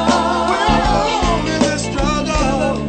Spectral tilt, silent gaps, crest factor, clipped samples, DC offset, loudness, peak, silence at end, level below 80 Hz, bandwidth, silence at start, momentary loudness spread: -4.5 dB/octave; none; 16 dB; under 0.1%; under 0.1%; -16 LUFS; 0 dBFS; 0 s; -26 dBFS; 9.2 kHz; 0 s; 3 LU